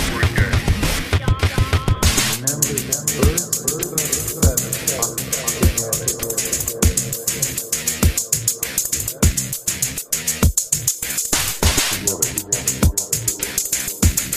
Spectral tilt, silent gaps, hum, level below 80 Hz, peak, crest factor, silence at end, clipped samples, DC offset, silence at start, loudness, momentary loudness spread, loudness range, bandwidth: -3 dB/octave; none; none; -28 dBFS; 0 dBFS; 18 dB; 0 s; under 0.1%; under 0.1%; 0 s; -18 LUFS; 3 LU; 1 LU; 15.5 kHz